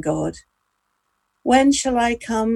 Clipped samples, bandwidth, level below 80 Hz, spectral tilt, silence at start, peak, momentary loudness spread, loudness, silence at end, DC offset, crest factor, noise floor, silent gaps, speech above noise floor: under 0.1%; 12 kHz; -46 dBFS; -4 dB/octave; 0 s; -2 dBFS; 12 LU; -19 LUFS; 0 s; under 0.1%; 18 dB; -72 dBFS; none; 53 dB